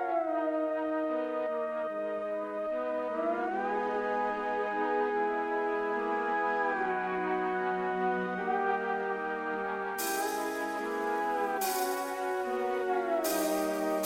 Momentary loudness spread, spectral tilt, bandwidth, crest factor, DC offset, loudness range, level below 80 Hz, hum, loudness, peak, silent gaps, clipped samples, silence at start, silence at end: 4 LU; -4 dB/octave; 17 kHz; 14 dB; under 0.1%; 2 LU; -68 dBFS; 50 Hz at -75 dBFS; -32 LUFS; -18 dBFS; none; under 0.1%; 0 s; 0 s